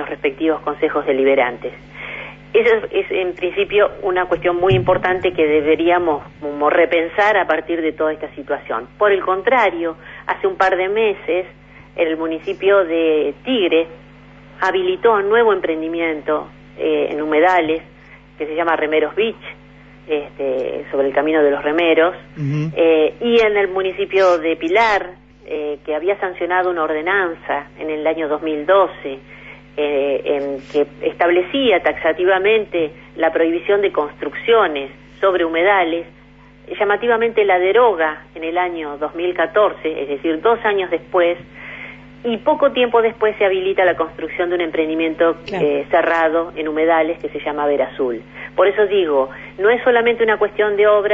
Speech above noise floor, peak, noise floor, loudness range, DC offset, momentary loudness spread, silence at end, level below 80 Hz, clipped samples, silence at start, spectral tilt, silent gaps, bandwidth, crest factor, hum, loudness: 27 dB; -2 dBFS; -44 dBFS; 3 LU; under 0.1%; 11 LU; 0 s; -50 dBFS; under 0.1%; 0 s; -6.5 dB/octave; none; 7.2 kHz; 14 dB; 50 Hz at -45 dBFS; -17 LUFS